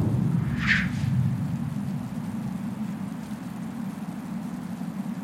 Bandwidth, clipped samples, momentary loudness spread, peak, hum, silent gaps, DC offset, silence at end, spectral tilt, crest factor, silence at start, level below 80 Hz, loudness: 16 kHz; under 0.1%; 11 LU; -6 dBFS; none; none; under 0.1%; 0 s; -6.5 dB/octave; 22 dB; 0 s; -48 dBFS; -29 LUFS